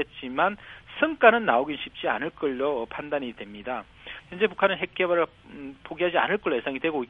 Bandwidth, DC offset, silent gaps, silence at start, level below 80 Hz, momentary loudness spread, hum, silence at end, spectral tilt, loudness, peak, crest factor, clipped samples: 4.8 kHz; under 0.1%; none; 0 s; -60 dBFS; 20 LU; none; 0.05 s; -7 dB/octave; -25 LUFS; -2 dBFS; 24 dB; under 0.1%